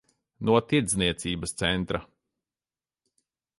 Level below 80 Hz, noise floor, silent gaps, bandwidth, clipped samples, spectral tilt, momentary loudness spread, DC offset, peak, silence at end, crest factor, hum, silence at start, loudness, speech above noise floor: -50 dBFS; under -90 dBFS; none; 11.5 kHz; under 0.1%; -4 dB/octave; 9 LU; under 0.1%; -6 dBFS; 1.55 s; 22 dB; none; 0.4 s; -26 LUFS; over 64 dB